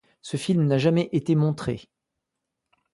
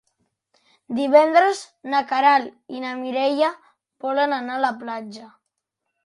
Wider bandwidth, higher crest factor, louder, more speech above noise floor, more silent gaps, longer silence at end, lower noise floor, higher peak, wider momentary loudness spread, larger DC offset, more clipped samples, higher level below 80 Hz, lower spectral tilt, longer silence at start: about the same, 11.5 kHz vs 11.5 kHz; about the same, 16 dB vs 20 dB; second, -24 LUFS vs -21 LUFS; about the same, 60 dB vs 59 dB; neither; first, 1.15 s vs 0.75 s; about the same, -83 dBFS vs -80 dBFS; second, -8 dBFS vs -2 dBFS; second, 12 LU vs 15 LU; neither; neither; first, -58 dBFS vs -76 dBFS; first, -7.5 dB/octave vs -3.5 dB/octave; second, 0.25 s vs 0.9 s